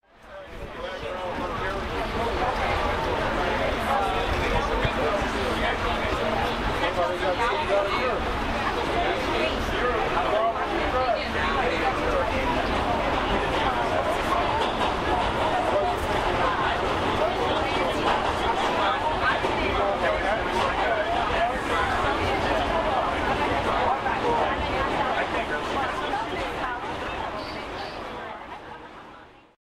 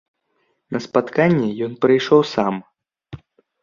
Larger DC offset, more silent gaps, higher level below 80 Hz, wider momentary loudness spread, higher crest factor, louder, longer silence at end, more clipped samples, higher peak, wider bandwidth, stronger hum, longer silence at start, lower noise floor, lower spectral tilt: neither; neither; first, -38 dBFS vs -58 dBFS; second, 7 LU vs 13 LU; about the same, 14 dB vs 18 dB; second, -25 LUFS vs -18 LUFS; about the same, 0.35 s vs 0.45 s; neither; second, -10 dBFS vs -2 dBFS; first, 16 kHz vs 7.4 kHz; neither; second, 0.25 s vs 0.7 s; second, -48 dBFS vs -68 dBFS; second, -5 dB/octave vs -7 dB/octave